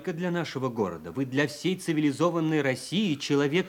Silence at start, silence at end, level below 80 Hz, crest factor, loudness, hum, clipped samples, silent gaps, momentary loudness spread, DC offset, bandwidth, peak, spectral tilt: 0 s; 0 s; -70 dBFS; 16 dB; -28 LUFS; none; under 0.1%; none; 6 LU; under 0.1%; 17 kHz; -10 dBFS; -5.5 dB/octave